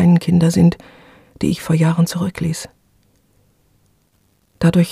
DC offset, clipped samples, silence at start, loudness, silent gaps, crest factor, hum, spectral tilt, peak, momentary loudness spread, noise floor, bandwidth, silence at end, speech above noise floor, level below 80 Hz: under 0.1%; under 0.1%; 0 s; -17 LUFS; none; 16 dB; 50 Hz at -45 dBFS; -7 dB/octave; -2 dBFS; 12 LU; -60 dBFS; 13.5 kHz; 0 s; 45 dB; -46 dBFS